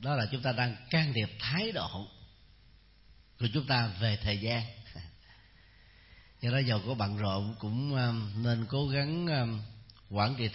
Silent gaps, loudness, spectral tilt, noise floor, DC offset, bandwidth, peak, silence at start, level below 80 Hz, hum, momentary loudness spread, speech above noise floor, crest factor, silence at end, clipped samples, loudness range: none; -32 LUFS; -4.5 dB/octave; -60 dBFS; under 0.1%; 5.8 kHz; -14 dBFS; 0 s; -56 dBFS; none; 12 LU; 28 dB; 18 dB; 0 s; under 0.1%; 3 LU